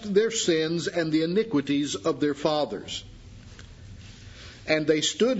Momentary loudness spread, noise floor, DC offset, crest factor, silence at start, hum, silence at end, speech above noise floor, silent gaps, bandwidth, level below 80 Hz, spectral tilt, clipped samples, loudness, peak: 23 LU; -45 dBFS; under 0.1%; 20 dB; 0 s; none; 0 s; 20 dB; none; 8 kHz; -54 dBFS; -4 dB/octave; under 0.1%; -26 LUFS; -6 dBFS